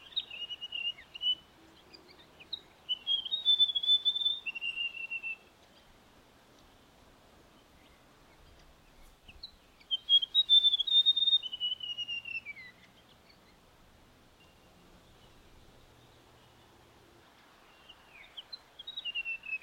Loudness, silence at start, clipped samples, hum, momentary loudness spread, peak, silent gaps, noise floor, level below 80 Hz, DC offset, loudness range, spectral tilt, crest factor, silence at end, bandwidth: -28 LUFS; 0.1 s; under 0.1%; none; 23 LU; -16 dBFS; none; -61 dBFS; -68 dBFS; under 0.1%; 18 LU; -0.5 dB/octave; 20 dB; 0.05 s; 16.5 kHz